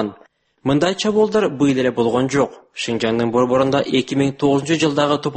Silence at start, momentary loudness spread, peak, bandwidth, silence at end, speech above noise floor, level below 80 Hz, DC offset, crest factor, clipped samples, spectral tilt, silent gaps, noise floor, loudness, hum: 0 s; 6 LU; -4 dBFS; 8.8 kHz; 0 s; 34 dB; -54 dBFS; under 0.1%; 14 dB; under 0.1%; -5.5 dB/octave; none; -52 dBFS; -18 LUFS; none